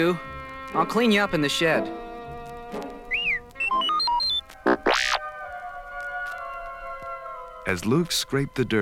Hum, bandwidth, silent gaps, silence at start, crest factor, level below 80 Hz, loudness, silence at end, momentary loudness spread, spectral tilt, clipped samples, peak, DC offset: none; 17 kHz; none; 0 s; 18 dB; -48 dBFS; -24 LUFS; 0 s; 15 LU; -4 dB/octave; under 0.1%; -8 dBFS; under 0.1%